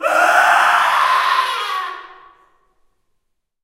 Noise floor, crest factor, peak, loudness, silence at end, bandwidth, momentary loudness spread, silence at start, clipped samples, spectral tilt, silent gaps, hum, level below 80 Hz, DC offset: -69 dBFS; 18 dB; 0 dBFS; -14 LUFS; 1.5 s; 16 kHz; 13 LU; 0 s; under 0.1%; 0.5 dB/octave; none; none; -68 dBFS; under 0.1%